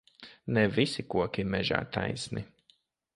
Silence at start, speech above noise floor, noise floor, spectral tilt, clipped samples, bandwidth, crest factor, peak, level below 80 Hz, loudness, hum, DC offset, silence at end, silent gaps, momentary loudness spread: 0.2 s; 38 dB; -68 dBFS; -5.5 dB/octave; under 0.1%; 11.5 kHz; 24 dB; -8 dBFS; -56 dBFS; -30 LUFS; none; under 0.1%; 0.7 s; none; 16 LU